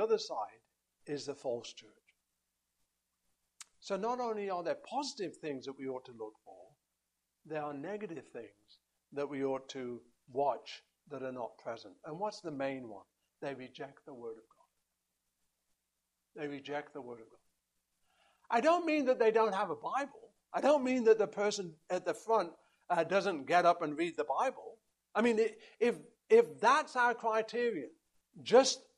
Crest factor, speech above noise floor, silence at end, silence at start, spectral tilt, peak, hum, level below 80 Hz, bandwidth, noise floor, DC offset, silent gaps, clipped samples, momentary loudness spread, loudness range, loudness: 24 dB; 52 dB; 0.2 s; 0 s; -4 dB/octave; -12 dBFS; none; -84 dBFS; 11.5 kHz; -86 dBFS; under 0.1%; none; under 0.1%; 20 LU; 16 LU; -34 LUFS